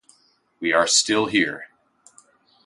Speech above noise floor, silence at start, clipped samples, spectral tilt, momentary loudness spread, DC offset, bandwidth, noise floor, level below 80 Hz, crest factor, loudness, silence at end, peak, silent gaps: 41 dB; 0.6 s; under 0.1%; -1.5 dB/octave; 11 LU; under 0.1%; 11.5 kHz; -61 dBFS; -64 dBFS; 20 dB; -19 LUFS; 1 s; -4 dBFS; none